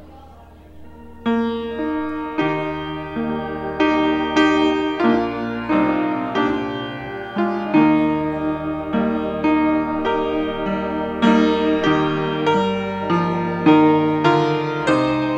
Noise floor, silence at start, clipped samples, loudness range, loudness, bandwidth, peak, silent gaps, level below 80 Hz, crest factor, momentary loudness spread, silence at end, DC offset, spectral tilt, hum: -43 dBFS; 0 s; under 0.1%; 4 LU; -19 LUFS; 8.4 kHz; -2 dBFS; none; -46 dBFS; 16 dB; 9 LU; 0 s; under 0.1%; -7 dB/octave; none